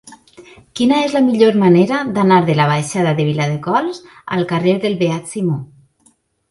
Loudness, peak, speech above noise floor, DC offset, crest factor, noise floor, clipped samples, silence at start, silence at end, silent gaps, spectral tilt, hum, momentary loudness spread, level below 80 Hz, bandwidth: -15 LUFS; 0 dBFS; 42 dB; under 0.1%; 16 dB; -56 dBFS; under 0.1%; 0.05 s; 0.85 s; none; -6.5 dB/octave; none; 9 LU; -56 dBFS; 11.5 kHz